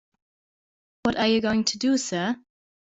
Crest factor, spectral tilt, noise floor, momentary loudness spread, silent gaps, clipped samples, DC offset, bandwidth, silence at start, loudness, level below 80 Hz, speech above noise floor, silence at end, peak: 18 dB; -3.5 dB/octave; under -90 dBFS; 7 LU; none; under 0.1%; under 0.1%; 8.2 kHz; 1.05 s; -24 LUFS; -58 dBFS; over 66 dB; 0.45 s; -8 dBFS